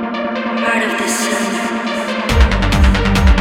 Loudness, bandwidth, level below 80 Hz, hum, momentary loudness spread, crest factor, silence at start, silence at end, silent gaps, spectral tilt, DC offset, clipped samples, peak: -15 LUFS; 16 kHz; -18 dBFS; none; 6 LU; 14 dB; 0 s; 0 s; none; -5 dB/octave; under 0.1%; under 0.1%; 0 dBFS